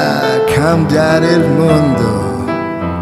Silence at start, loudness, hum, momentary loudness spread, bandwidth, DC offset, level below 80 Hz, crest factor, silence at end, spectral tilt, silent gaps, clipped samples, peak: 0 s; -12 LUFS; none; 7 LU; 13.5 kHz; under 0.1%; -36 dBFS; 12 dB; 0 s; -6.5 dB/octave; none; under 0.1%; 0 dBFS